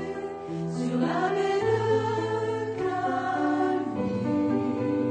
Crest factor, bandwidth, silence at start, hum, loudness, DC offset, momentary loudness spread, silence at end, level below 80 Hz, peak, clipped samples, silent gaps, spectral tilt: 14 dB; 9.4 kHz; 0 s; none; -27 LUFS; under 0.1%; 6 LU; 0 s; -62 dBFS; -12 dBFS; under 0.1%; none; -7 dB/octave